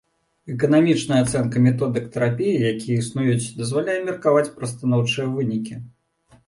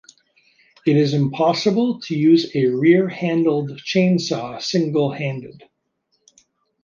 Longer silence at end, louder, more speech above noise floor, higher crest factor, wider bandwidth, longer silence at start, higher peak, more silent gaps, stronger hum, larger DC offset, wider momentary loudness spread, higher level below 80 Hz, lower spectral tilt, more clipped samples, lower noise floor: second, 0.6 s vs 1.3 s; about the same, -21 LUFS vs -19 LUFS; second, 36 dB vs 52 dB; about the same, 16 dB vs 16 dB; first, 11.5 kHz vs 7.2 kHz; second, 0.45 s vs 0.85 s; about the same, -4 dBFS vs -2 dBFS; neither; neither; neither; about the same, 8 LU vs 9 LU; first, -54 dBFS vs -66 dBFS; about the same, -6.5 dB/octave vs -6.5 dB/octave; neither; second, -57 dBFS vs -70 dBFS